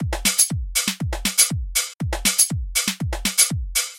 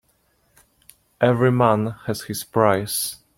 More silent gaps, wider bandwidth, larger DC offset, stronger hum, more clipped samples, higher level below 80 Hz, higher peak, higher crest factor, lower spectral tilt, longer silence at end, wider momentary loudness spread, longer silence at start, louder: first, 1.94-1.99 s vs none; about the same, 17 kHz vs 16.5 kHz; neither; neither; neither; first, -32 dBFS vs -58 dBFS; about the same, -2 dBFS vs -2 dBFS; about the same, 20 dB vs 20 dB; second, -1.5 dB/octave vs -5.5 dB/octave; second, 0 s vs 0.2 s; second, 7 LU vs 10 LU; second, 0 s vs 1.2 s; about the same, -19 LUFS vs -20 LUFS